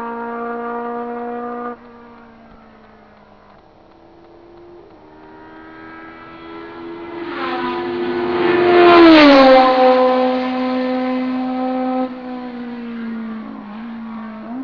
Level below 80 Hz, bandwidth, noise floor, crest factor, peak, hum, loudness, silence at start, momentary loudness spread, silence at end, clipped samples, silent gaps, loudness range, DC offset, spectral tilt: -50 dBFS; 5.4 kHz; -46 dBFS; 18 dB; 0 dBFS; 50 Hz at -60 dBFS; -14 LUFS; 0 s; 25 LU; 0 s; under 0.1%; none; 21 LU; 0.1%; -6 dB/octave